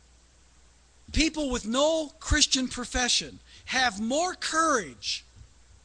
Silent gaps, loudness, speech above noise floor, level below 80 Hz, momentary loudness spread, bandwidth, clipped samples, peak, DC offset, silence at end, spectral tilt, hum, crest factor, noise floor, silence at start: none; -26 LUFS; 31 dB; -40 dBFS; 9 LU; 10.5 kHz; under 0.1%; -6 dBFS; under 0.1%; 0.4 s; -2.5 dB/octave; none; 24 dB; -58 dBFS; 1.1 s